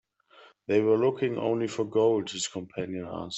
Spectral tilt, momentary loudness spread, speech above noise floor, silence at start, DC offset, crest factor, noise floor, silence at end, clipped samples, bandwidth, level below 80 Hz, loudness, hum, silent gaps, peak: -5 dB/octave; 11 LU; 30 dB; 0.4 s; under 0.1%; 16 dB; -57 dBFS; 0 s; under 0.1%; 8.4 kHz; -68 dBFS; -28 LUFS; none; none; -12 dBFS